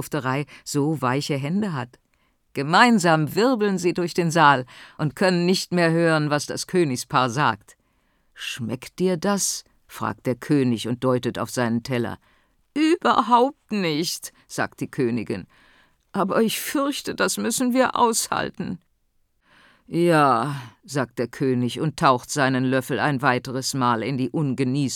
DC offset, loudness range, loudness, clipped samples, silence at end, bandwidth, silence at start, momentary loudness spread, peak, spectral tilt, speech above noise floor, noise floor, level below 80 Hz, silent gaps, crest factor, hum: under 0.1%; 5 LU; -22 LUFS; under 0.1%; 0 s; 19.5 kHz; 0 s; 13 LU; -2 dBFS; -4.5 dB/octave; 45 dB; -67 dBFS; -62 dBFS; none; 20 dB; none